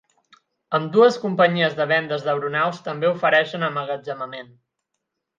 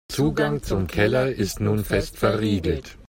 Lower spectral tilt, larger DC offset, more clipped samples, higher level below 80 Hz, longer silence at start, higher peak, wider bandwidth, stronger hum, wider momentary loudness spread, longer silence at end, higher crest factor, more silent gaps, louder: about the same, -6 dB/octave vs -6 dB/octave; neither; neither; second, -74 dBFS vs -38 dBFS; first, 0.7 s vs 0.1 s; first, -2 dBFS vs -6 dBFS; second, 7.4 kHz vs 16.5 kHz; neither; first, 12 LU vs 5 LU; first, 0.95 s vs 0.05 s; about the same, 20 dB vs 18 dB; neither; about the same, -21 LUFS vs -23 LUFS